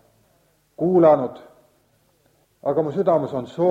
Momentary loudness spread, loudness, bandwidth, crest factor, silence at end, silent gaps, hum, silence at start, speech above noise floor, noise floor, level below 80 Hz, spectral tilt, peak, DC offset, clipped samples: 13 LU; -20 LUFS; 7.8 kHz; 18 dB; 0 s; none; none; 0.8 s; 44 dB; -62 dBFS; -64 dBFS; -9.5 dB/octave; -4 dBFS; under 0.1%; under 0.1%